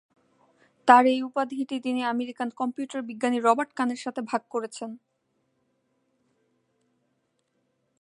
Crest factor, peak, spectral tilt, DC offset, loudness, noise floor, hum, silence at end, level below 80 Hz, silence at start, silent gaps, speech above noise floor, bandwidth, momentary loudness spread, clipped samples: 26 dB; -2 dBFS; -4 dB/octave; under 0.1%; -25 LUFS; -74 dBFS; none; 3.05 s; -82 dBFS; 0.85 s; none; 49 dB; 11 kHz; 15 LU; under 0.1%